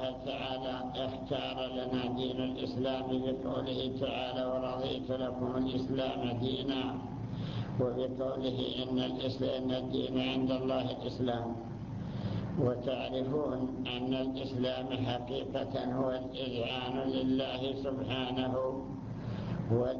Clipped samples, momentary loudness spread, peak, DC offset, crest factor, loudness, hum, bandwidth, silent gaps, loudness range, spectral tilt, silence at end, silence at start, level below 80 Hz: under 0.1%; 5 LU; -18 dBFS; under 0.1%; 16 dB; -35 LUFS; none; 7 kHz; none; 1 LU; -7.5 dB/octave; 0 s; 0 s; -54 dBFS